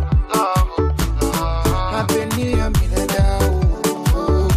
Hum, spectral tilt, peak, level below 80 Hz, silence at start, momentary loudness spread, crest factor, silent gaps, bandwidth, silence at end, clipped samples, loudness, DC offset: none; -5.5 dB/octave; -6 dBFS; -20 dBFS; 0 s; 3 LU; 12 dB; none; 16 kHz; 0 s; under 0.1%; -19 LUFS; under 0.1%